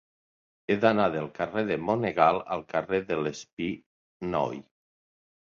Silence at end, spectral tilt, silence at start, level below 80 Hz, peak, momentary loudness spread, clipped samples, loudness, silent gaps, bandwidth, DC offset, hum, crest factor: 0.95 s; -6 dB/octave; 0.7 s; -62 dBFS; -6 dBFS; 11 LU; under 0.1%; -28 LUFS; 3.53-3.57 s, 3.86-4.20 s; 7.6 kHz; under 0.1%; none; 22 dB